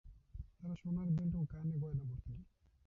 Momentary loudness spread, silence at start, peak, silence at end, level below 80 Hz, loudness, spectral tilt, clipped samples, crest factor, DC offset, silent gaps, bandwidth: 17 LU; 0.05 s; -28 dBFS; 0.45 s; -56 dBFS; -41 LUFS; -12 dB/octave; under 0.1%; 14 dB; under 0.1%; none; 3.3 kHz